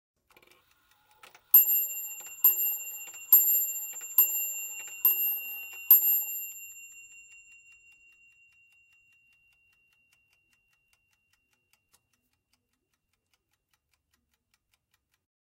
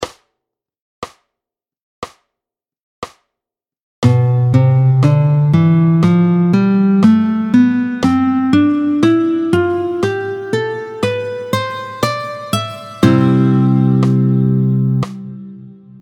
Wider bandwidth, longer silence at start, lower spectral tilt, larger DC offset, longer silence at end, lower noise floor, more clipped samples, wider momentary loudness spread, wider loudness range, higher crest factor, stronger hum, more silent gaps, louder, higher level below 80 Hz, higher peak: first, 16 kHz vs 13 kHz; first, 1.55 s vs 0 s; second, 3 dB/octave vs -8 dB/octave; neither; first, 8.55 s vs 0.3 s; second, -80 dBFS vs -85 dBFS; neither; about the same, 20 LU vs 21 LU; second, 4 LU vs 7 LU; first, 26 dB vs 14 dB; neither; second, none vs 0.81-1.02 s, 1.82-2.02 s, 2.83-3.02 s, 3.82-4.02 s; second, -23 LUFS vs -14 LUFS; second, -84 dBFS vs -52 dBFS; second, -4 dBFS vs 0 dBFS